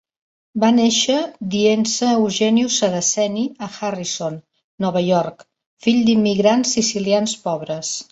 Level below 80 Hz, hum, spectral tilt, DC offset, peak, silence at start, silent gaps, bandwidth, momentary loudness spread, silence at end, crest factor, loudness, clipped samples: -60 dBFS; none; -4 dB/octave; under 0.1%; -2 dBFS; 0.55 s; 4.64-4.78 s, 5.66-5.77 s; 8.2 kHz; 10 LU; 0.1 s; 16 dB; -18 LUFS; under 0.1%